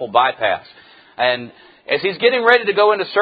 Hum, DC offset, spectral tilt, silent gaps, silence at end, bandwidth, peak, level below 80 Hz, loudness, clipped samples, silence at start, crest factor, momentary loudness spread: none; under 0.1%; -6 dB/octave; none; 0 s; 5 kHz; 0 dBFS; -62 dBFS; -16 LUFS; under 0.1%; 0 s; 18 dB; 11 LU